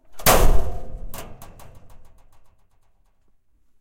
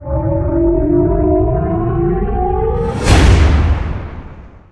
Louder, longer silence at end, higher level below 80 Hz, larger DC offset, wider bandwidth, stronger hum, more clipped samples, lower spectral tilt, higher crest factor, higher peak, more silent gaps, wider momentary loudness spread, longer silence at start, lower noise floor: second, -20 LUFS vs -14 LUFS; first, 1.85 s vs 0.15 s; second, -26 dBFS vs -18 dBFS; neither; first, 16.5 kHz vs 11 kHz; neither; neither; second, -3.5 dB/octave vs -7 dB/octave; about the same, 18 dB vs 14 dB; about the same, -2 dBFS vs 0 dBFS; neither; first, 27 LU vs 9 LU; about the same, 0.1 s vs 0 s; first, -58 dBFS vs -34 dBFS